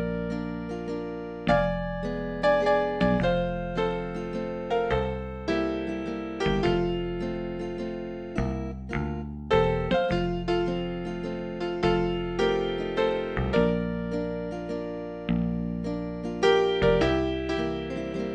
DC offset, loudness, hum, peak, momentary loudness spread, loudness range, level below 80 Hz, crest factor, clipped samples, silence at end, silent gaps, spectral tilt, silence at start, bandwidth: under 0.1%; -28 LUFS; none; -8 dBFS; 10 LU; 3 LU; -40 dBFS; 18 dB; under 0.1%; 0 s; none; -7 dB/octave; 0 s; 8.8 kHz